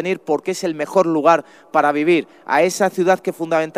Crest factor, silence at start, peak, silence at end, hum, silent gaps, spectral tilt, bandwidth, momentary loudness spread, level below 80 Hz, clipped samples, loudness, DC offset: 18 dB; 0 s; 0 dBFS; 0 s; none; none; -5 dB/octave; 15.5 kHz; 6 LU; -70 dBFS; under 0.1%; -18 LUFS; under 0.1%